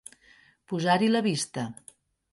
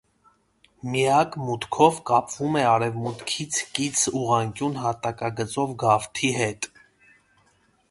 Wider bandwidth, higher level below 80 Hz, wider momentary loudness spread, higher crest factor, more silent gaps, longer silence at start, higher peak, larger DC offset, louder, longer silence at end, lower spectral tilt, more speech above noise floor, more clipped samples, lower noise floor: about the same, 11.5 kHz vs 11.5 kHz; second, -70 dBFS vs -60 dBFS; first, 21 LU vs 9 LU; about the same, 18 dB vs 22 dB; neither; second, 0.7 s vs 0.85 s; second, -10 dBFS vs -2 dBFS; neither; second, -27 LUFS vs -24 LUFS; second, 0.6 s vs 1.25 s; about the same, -4.5 dB/octave vs -4 dB/octave; second, 34 dB vs 40 dB; neither; second, -59 dBFS vs -63 dBFS